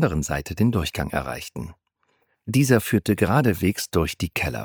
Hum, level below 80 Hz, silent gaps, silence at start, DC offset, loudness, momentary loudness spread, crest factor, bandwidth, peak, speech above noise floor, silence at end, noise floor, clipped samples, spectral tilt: none; -40 dBFS; none; 0 s; under 0.1%; -23 LUFS; 14 LU; 20 dB; over 20 kHz; -2 dBFS; 47 dB; 0 s; -69 dBFS; under 0.1%; -5.5 dB/octave